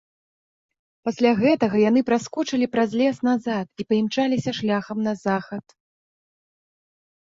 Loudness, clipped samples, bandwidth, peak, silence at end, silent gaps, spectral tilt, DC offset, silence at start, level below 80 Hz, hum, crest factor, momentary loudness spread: -22 LUFS; under 0.1%; 7.8 kHz; -6 dBFS; 1.8 s; none; -6 dB/octave; under 0.1%; 1.05 s; -64 dBFS; none; 18 dB; 9 LU